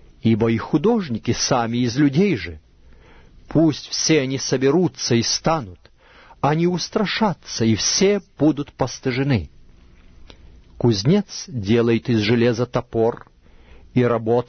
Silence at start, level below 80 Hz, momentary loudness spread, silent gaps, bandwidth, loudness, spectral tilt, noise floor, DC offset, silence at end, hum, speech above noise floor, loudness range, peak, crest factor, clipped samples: 0.25 s; -46 dBFS; 7 LU; none; 6.6 kHz; -20 LUFS; -5 dB/octave; -48 dBFS; under 0.1%; 0.05 s; none; 29 dB; 2 LU; -4 dBFS; 16 dB; under 0.1%